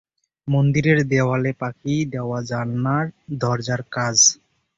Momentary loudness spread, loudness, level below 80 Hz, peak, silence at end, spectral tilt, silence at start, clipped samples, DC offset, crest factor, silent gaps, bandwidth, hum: 12 LU; -20 LUFS; -52 dBFS; -4 dBFS; 0.45 s; -4 dB/octave; 0.45 s; under 0.1%; under 0.1%; 18 dB; none; 7.8 kHz; none